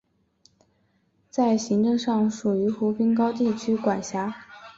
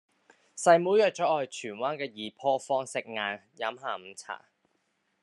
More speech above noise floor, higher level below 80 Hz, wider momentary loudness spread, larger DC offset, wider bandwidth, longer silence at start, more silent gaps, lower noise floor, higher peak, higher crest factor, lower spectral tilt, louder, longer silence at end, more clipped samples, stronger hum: about the same, 44 dB vs 47 dB; first, -66 dBFS vs -86 dBFS; second, 8 LU vs 18 LU; neither; second, 7.8 kHz vs 11.5 kHz; first, 1.35 s vs 0.55 s; neither; second, -67 dBFS vs -75 dBFS; about the same, -10 dBFS vs -8 dBFS; second, 16 dB vs 22 dB; first, -6 dB/octave vs -3.5 dB/octave; first, -24 LUFS vs -29 LUFS; second, 0.05 s vs 0.85 s; neither; neither